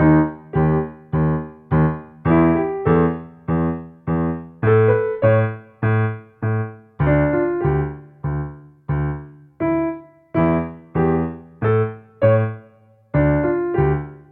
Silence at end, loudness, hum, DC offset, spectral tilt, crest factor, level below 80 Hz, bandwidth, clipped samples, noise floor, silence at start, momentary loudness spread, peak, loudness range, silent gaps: 0.15 s; -20 LUFS; none; under 0.1%; -13 dB/octave; 16 dB; -36 dBFS; 3.8 kHz; under 0.1%; -51 dBFS; 0 s; 10 LU; -4 dBFS; 4 LU; none